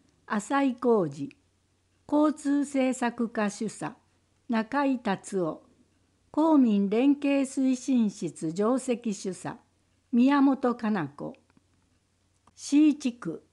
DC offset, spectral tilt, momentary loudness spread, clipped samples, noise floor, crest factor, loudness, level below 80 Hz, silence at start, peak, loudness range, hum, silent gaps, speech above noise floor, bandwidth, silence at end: under 0.1%; -6 dB/octave; 15 LU; under 0.1%; -70 dBFS; 14 dB; -27 LUFS; -74 dBFS; 0.3 s; -14 dBFS; 4 LU; none; none; 44 dB; 11.5 kHz; 0.15 s